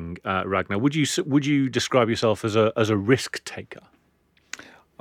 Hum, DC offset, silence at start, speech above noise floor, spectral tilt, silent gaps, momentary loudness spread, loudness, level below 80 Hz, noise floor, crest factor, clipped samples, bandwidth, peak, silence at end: none; under 0.1%; 0 s; 41 dB; -5 dB/octave; none; 18 LU; -23 LUFS; -58 dBFS; -64 dBFS; 18 dB; under 0.1%; 15.5 kHz; -6 dBFS; 0.45 s